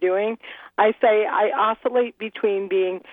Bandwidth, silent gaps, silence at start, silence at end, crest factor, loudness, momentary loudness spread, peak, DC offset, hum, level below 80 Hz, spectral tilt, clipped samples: 3.9 kHz; none; 0 s; 0 s; 16 dB; -21 LUFS; 9 LU; -6 dBFS; under 0.1%; none; -74 dBFS; -7.5 dB/octave; under 0.1%